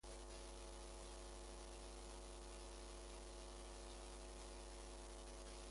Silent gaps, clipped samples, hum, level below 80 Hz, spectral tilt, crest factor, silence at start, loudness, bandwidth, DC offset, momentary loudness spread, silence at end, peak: none; under 0.1%; 60 Hz at -80 dBFS; -58 dBFS; -3.5 dB/octave; 12 dB; 0.05 s; -56 LUFS; 11.5 kHz; under 0.1%; 0 LU; 0 s; -42 dBFS